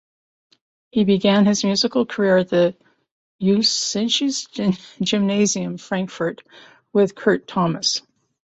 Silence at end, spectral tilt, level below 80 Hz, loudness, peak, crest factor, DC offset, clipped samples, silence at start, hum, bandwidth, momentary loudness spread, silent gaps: 0.55 s; -4.5 dB/octave; -62 dBFS; -20 LUFS; -4 dBFS; 18 dB; under 0.1%; under 0.1%; 0.95 s; none; 8.2 kHz; 9 LU; 3.11-3.39 s